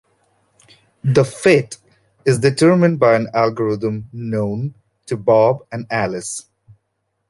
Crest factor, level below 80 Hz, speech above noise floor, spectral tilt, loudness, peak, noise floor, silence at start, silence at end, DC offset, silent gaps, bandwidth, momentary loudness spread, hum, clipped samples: 16 dB; -54 dBFS; 56 dB; -6 dB/octave; -17 LUFS; -2 dBFS; -72 dBFS; 1.05 s; 0.9 s; under 0.1%; none; 11.5 kHz; 14 LU; none; under 0.1%